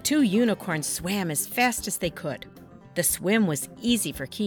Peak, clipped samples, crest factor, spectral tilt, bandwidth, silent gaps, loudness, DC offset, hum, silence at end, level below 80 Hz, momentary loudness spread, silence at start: -8 dBFS; under 0.1%; 18 dB; -3.5 dB/octave; 19 kHz; none; -25 LUFS; under 0.1%; none; 0 s; -54 dBFS; 12 LU; 0 s